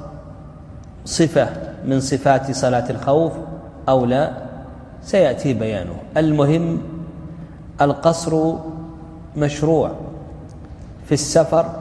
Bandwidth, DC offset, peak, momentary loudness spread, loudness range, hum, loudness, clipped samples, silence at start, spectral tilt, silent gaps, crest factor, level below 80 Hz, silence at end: 11 kHz; under 0.1%; 0 dBFS; 21 LU; 2 LU; none; -19 LUFS; under 0.1%; 0 s; -6 dB/octave; none; 18 dB; -42 dBFS; 0 s